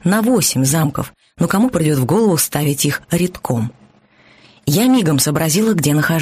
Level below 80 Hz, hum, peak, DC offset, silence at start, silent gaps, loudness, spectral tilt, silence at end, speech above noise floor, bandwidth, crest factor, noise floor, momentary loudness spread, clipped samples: -46 dBFS; none; -2 dBFS; under 0.1%; 0.05 s; none; -16 LUFS; -5 dB/octave; 0 s; 35 dB; 15.5 kHz; 14 dB; -50 dBFS; 8 LU; under 0.1%